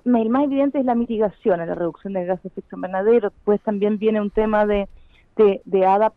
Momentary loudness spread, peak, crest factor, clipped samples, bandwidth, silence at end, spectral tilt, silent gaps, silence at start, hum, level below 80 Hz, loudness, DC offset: 9 LU; -6 dBFS; 14 dB; under 0.1%; 4.2 kHz; 0.05 s; -9.5 dB/octave; none; 0.05 s; none; -46 dBFS; -20 LUFS; under 0.1%